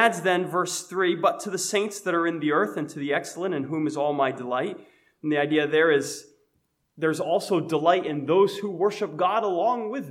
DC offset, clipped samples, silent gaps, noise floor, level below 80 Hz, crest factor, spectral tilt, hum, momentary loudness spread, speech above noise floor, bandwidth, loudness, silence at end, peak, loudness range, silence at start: under 0.1%; under 0.1%; none; -72 dBFS; -80 dBFS; 20 dB; -4.5 dB/octave; none; 7 LU; 48 dB; 16 kHz; -25 LUFS; 0 s; -6 dBFS; 2 LU; 0 s